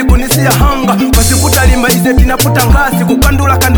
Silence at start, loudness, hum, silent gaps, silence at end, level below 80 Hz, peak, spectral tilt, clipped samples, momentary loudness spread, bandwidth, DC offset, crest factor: 0 s; -9 LUFS; none; none; 0 s; -12 dBFS; 0 dBFS; -4.5 dB/octave; 0.3%; 2 LU; over 20 kHz; under 0.1%; 8 dB